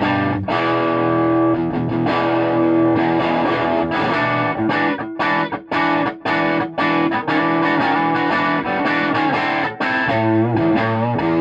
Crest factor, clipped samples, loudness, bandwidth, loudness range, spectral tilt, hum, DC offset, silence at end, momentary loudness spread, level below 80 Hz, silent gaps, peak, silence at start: 12 dB; under 0.1%; -18 LUFS; 7.4 kHz; 1 LU; -7.5 dB/octave; none; under 0.1%; 0 s; 3 LU; -52 dBFS; none; -4 dBFS; 0 s